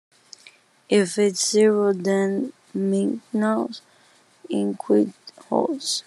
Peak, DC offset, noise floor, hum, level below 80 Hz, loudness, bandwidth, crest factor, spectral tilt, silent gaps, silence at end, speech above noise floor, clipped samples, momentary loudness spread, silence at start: -6 dBFS; under 0.1%; -57 dBFS; none; -78 dBFS; -22 LUFS; 12.5 kHz; 16 dB; -4.5 dB/octave; none; 0.05 s; 35 dB; under 0.1%; 10 LU; 0.9 s